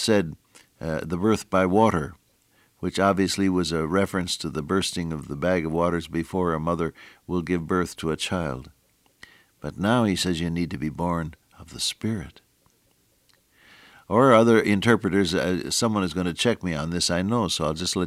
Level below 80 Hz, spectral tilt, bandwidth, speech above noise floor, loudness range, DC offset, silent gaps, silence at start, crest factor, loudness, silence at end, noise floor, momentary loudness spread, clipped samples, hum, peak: -48 dBFS; -5 dB/octave; 16 kHz; 41 dB; 7 LU; under 0.1%; none; 0 s; 20 dB; -24 LUFS; 0 s; -65 dBFS; 11 LU; under 0.1%; none; -4 dBFS